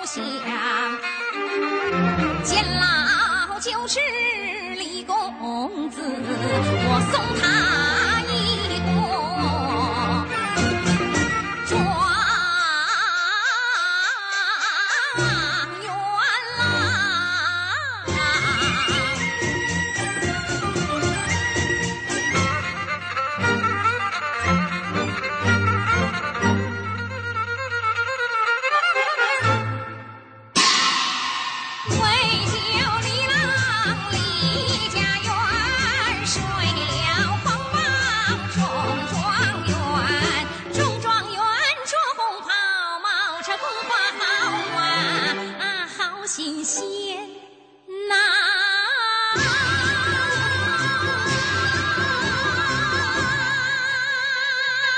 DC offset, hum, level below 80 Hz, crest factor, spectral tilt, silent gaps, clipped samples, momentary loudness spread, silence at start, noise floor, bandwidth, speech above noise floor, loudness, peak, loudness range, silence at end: under 0.1%; none; -46 dBFS; 18 dB; -3.5 dB/octave; none; under 0.1%; 7 LU; 0 s; -47 dBFS; 9.4 kHz; 25 dB; -21 LUFS; -4 dBFS; 3 LU; 0 s